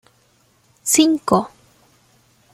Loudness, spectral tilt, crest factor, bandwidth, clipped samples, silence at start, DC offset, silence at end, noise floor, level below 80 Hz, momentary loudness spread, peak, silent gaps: -17 LUFS; -3.5 dB/octave; 20 dB; 15.5 kHz; under 0.1%; 0.85 s; under 0.1%; 1.05 s; -58 dBFS; -60 dBFS; 14 LU; -2 dBFS; none